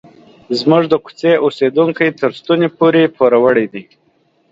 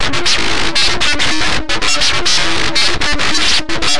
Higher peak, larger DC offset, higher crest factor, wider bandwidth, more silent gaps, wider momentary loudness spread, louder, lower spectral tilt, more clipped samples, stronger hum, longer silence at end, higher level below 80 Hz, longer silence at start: about the same, 0 dBFS vs 0 dBFS; second, under 0.1% vs 20%; about the same, 14 dB vs 12 dB; second, 7.8 kHz vs 11.5 kHz; neither; first, 7 LU vs 3 LU; about the same, -13 LUFS vs -12 LUFS; first, -7 dB/octave vs -1.5 dB/octave; neither; neither; first, 0.7 s vs 0 s; second, -58 dBFS vs -30 dBFS; first, 0.5 s vs 0 s